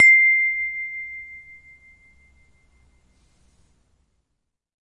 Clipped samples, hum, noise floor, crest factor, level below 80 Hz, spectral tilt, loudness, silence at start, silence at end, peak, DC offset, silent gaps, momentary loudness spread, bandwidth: under 0.1%; none; -77 dBFS; 20 dB; -62 dBFS; 0.5 dB/octave; -17 LUFS; 0 s; 3.6 s; -2 dBFS; under 0.1%; none; 26 LU; 10.5 kHz